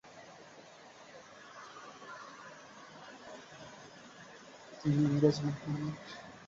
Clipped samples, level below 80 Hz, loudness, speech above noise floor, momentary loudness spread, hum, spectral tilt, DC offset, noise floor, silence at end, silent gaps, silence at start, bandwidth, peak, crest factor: under 0.1%; -70 dBFS; -34 LUFS; 23 dB; 23 LU; none; -7 dB/octave; under 0.1%; -55 dBFS; 0 s; none; 0.05 s; 7.6 kHz; -14 dBFS; 24 dB